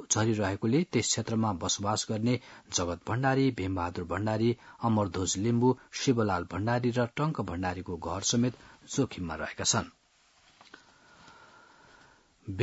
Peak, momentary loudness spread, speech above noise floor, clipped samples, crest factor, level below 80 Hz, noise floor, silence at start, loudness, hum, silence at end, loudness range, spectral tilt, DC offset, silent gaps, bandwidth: -12 dBFS; 7 LU; 35 dB; under 0.1%; 20 dB; -62 dBFS; -64 dBFS; 0 s; -30 LUFS; none; 0 s; 6 LU; -4.5 dB/octave; under 0.1%; none; 8 kHz